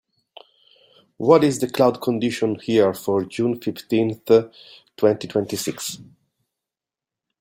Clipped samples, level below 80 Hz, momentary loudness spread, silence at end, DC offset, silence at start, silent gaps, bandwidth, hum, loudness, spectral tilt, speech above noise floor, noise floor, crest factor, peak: under 0.1%; -62 dBFS; 11 LU; 1.35 s; under 0.1%; 1.2 s; none; 16.5 kHz; none; -21 LUFS; -5.5 dB/octave; 68 dB; -89 dBFS; 20 dB; -2 dBFS